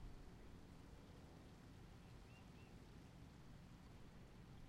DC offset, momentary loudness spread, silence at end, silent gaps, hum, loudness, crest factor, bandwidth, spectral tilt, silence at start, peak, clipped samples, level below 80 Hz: under 0.1%; 1 LU; 0 s; none; none; -63 LUFS; 14 dB; 15 kHz; -6 dB/octave; 0 s; -46 dBFS; under 0.1%; -66 dBFS